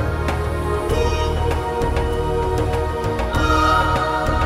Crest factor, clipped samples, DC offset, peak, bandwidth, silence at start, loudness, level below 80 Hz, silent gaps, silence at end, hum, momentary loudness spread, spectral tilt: 14 dB; under 0.1%; under 0.1%; -4 dBFS; 15 kHz; 0 s; -20 LUFS; -24 dBFS; none; 0 s; none; 6 LU; -6 dB/octave